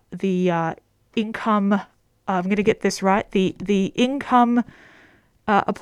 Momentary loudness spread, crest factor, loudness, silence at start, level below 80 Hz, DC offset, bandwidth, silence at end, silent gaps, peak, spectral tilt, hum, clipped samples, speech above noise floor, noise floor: 10 LU; 18 dB; -21 LUFS; 0.1 s; -54 dBFS; under 0.1%; 13 kHz; 0.05 s; none; -4 dBFS; -6 dB/octave; none; under 0.1%; 34 dB; -55 dBFS